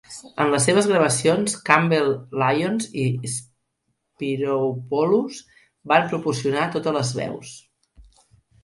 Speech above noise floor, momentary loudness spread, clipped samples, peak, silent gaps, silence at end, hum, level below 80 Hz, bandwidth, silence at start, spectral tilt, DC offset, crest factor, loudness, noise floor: 53 dB; 13 LU; under 0.1%; 0 dBFS; none; 0.65 s; none; -60 dBFS; 11.5 kHz; 0.1 s; -4.5 dB/octave; under 0.1%; 22 dB; -21 LUFS; -74 dBFS